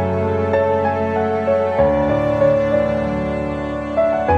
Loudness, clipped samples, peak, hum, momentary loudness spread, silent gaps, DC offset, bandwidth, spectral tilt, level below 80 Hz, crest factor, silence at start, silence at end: -18 LUFS; under 0.1%; -2 dBFS; none; 6 LU; none; under 0.1%; 8 kHz; -8.5 dB/octave; -36 dBFS; 14 dB; 0 s; 0 s